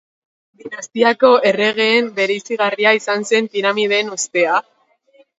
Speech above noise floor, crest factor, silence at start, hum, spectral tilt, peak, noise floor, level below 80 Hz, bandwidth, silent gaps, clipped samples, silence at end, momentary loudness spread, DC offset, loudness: 38 dB; 16 dB; 0.65 s; none; -2.5 dB/octave; 0 dBFS; -54 dBFS; -70 dBFS; 8 kHz; none; under 0.1%; 0.8 s; 7 LU; under 0.1%; -15 LUFS